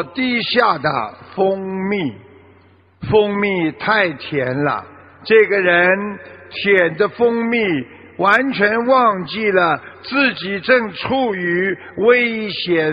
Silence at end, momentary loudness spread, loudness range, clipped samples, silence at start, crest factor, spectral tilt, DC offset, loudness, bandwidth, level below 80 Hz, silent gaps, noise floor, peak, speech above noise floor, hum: 0 s; 9 LU; 3 LU; under 0.1%; 0 s; 16 dB; -7.5 dB/octave; under 0.1%; -16 LUFS; 5.8 kHz; -54 dBFS; none; -50 dBFS; 0 dBFS; 33 dB; none